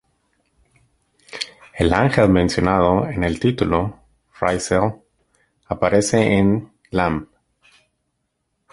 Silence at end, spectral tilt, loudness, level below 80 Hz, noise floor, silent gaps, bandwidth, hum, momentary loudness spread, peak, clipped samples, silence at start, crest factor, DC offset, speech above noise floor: 1.5 s; -6 dB/octave; -19 LUFS; -38 dBFS; -73 dBFS; none; 11.5 kHz; none; 14 LU; -2 dBFS; under 0.1%; 1.3 s; 18 dB; under 0.1%; 56 dB